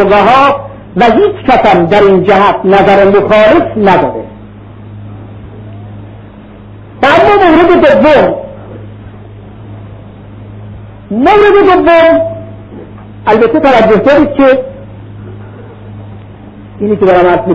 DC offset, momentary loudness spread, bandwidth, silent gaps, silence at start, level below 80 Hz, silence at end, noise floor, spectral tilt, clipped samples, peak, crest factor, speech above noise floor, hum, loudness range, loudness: under 0.1%; 24 LU; 7.8 kHz; none; 0 s; -34 dBFS; 0 s; -30 dBFS; -7 dB/octave; 0.5%; 0 dBFS; 8 dB; 25 dB; none; 7 LU; -6 LUFS